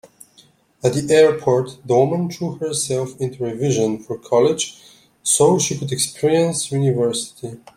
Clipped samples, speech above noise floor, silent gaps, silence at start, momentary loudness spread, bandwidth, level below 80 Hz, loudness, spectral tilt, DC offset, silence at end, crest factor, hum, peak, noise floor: under 0.1%; 35 dB; none; 0.85 s; 11 LU; 16 kHz; -58 dBFS; -19 LUFS; -4.5 dB/octave; under 0.1%; 0.2 s; 18 dB; none; -2 dBFS; -53 dBFS